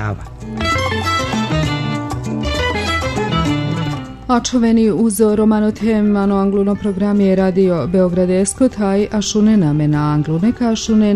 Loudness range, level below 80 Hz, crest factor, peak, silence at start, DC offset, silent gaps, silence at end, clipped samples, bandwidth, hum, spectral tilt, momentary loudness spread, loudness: 4 LU; -34 dBFS; 14 dB; -2 dBFS; 0 s; under 0.1%; none; 0 s; under 0.1%; 12.5 kHz; none; -6 dB/octave; 7 LU; -16 LUFS